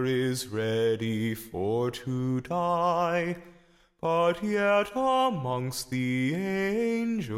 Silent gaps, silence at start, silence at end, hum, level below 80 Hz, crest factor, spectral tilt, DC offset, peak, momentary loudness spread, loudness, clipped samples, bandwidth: none; 0 s; 0 s; none; -60 dBFS; 14 dB; -6 dB/octave; under 0.1%; -14 dBFS; 7 LU; -28 LUFS; under 0.1%; 16.5 kHz